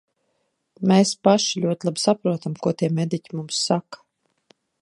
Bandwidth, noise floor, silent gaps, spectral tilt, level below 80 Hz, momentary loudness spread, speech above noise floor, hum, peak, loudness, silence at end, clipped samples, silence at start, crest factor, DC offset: 11.5 kHz; -72 dBFS; none; -5 dB/octave; -70 dBFS; 8 LU; 51 dB; none; -2 dBFS; -22 LUFS; 0.85 s; under 0.1%; 0.8 s; 20 dB; under 0.1%